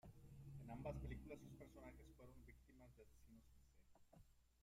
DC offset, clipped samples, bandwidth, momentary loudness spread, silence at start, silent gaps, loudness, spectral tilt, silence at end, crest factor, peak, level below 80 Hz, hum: under 0.1%; under 0.1%; 15.5 kHz; 16 LU; 0.05 s; none; -59 LUFS; -7.5 dB/octave; 0 s; 22 dB; -38 dBFS; -66 dBFS; none